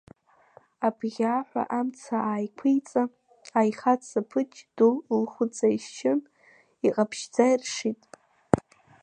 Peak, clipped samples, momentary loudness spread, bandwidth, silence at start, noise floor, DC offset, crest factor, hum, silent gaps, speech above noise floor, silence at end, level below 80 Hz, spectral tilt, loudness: 0 dBFS; under 0.1%; 7 LU; 10 kHz; 0.8 s; -60 dBFS; under 0.1%; 26 dB; none; none; 34 dB; 0.45 s; -60 dBFS; -5.5 dB/octave; -27 LUFS